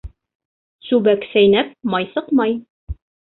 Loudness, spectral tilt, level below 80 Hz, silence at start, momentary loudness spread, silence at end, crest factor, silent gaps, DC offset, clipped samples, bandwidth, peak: -17 LUFS; -10 dB/octave; -40 dBFS; 0.05 s; 20 LU; 0.3 s; 16 dB; 0.35-0.79 s, 2.70-2.87 s; under 0.1%; under 0.1%; 4.2 kHz; -4 dBFS